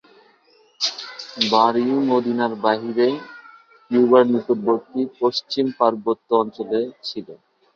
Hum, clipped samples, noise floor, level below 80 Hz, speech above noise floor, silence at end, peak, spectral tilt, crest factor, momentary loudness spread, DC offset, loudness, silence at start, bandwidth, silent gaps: none; under 0.1%; -57 dBFS; -68 dBFS; 37 dB; 0.4 s; -2 dBFS; -5 dB/octave; 20 dB; 14 LU; under 0.1%; -20 LUFS; 0.8 s; 7.4 kHz; none